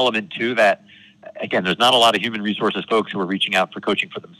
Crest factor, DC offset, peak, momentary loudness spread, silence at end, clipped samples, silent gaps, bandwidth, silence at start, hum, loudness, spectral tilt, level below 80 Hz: 14 dB; under 0.1%; -6 dBFS; 9 LU; 0.2 s; under 0.1%; none; 14 kHz; 0 s; none; -19 LUFS; -3.5 dB/octave; -68 dBFS